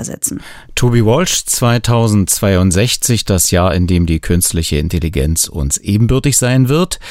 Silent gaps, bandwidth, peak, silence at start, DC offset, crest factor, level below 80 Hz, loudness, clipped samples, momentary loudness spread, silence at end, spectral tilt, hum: none; 16 kHz; 0 dBFS; 0 s; under 0.1%; 12 dB; -28 dBFS; -13 LUFS; under 0.1%; 5 LU; 0 s; -4.5 dB/octave; none